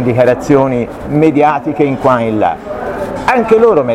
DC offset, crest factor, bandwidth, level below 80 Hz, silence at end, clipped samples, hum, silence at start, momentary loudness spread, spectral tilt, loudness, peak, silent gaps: under 0.1%; 12 dB; 13 kHz; -38 dBFS; 0 s; under 0.1%; none; 0 s; 10 LU; -7.5 dB/octave; -12 LUFS; 0 dBFS; none